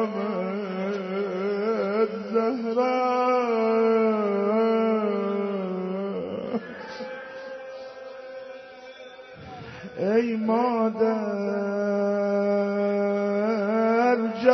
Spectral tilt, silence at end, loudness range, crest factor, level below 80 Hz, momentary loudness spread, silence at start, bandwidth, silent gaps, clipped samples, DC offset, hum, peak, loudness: -5.5 dB/octave; 0 s; 12 LU; 20 dB; -70 dBFS; 17 LU; 0 s; 6.2 kHz; none; under 0.1%; under 0.1%; none; -6 dBFS; -25 LUFS